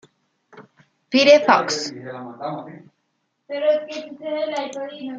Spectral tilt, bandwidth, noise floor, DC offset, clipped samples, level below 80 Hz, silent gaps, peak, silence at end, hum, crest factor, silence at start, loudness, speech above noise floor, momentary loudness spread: -3 dB/octave; 7.8 kHz; -72 dBFS; under 0.1%; under 0.1%; -74 dBFS; none; -2 dBFS; 0 s; none; 20 dB; 0.55 s; -20 LUFS; 52 dB; 20 LU